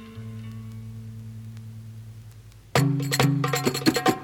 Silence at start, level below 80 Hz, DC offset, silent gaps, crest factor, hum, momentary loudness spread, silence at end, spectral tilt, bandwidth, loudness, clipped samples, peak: 0 s; -54 dBFS; under 0.1%; none; 22 dB; 50 Hz at -55 dBFS; 20 LU; 0 s; -5 dB/octave; 18.5 kHz; -23 LUFS; under 0.1%; -6 dBFS